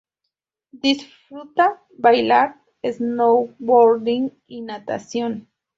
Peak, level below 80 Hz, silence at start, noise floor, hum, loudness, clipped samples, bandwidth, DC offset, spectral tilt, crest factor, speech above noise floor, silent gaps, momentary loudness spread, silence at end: -2 dBFS; -66 dBFS; 0.75 s; -81 dBFS; none; -19 LUFS; under 0.1%; 7.6 kHz; under 0.1%; -4.5 dB/octave; 18 dB; 62 dB; none; 17 LU; 0.35 s